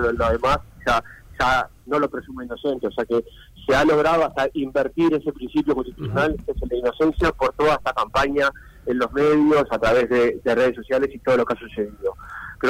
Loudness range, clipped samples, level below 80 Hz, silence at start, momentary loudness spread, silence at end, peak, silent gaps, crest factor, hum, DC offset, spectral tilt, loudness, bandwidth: 3 LU; under 0.1%; -38 dBFS; 0 s; 9 LU; 0 s; -10 dBFS; none; 12 dB; none; under 0.1%; -6 dB/octave; -21 LUFS; 16 kHz